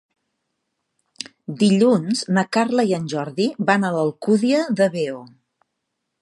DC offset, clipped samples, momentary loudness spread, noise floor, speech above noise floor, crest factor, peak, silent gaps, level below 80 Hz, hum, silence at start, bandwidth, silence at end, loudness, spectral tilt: under 0.1%; under 0.1%; 15 LU; -77 dBFS; 58 dB; 20 dB; -2 dBFS; none; -70 dBFS; none; 1.5 s; 11.5 kHz; 0.95 s; -19 LUFS; -5.5 dB/octave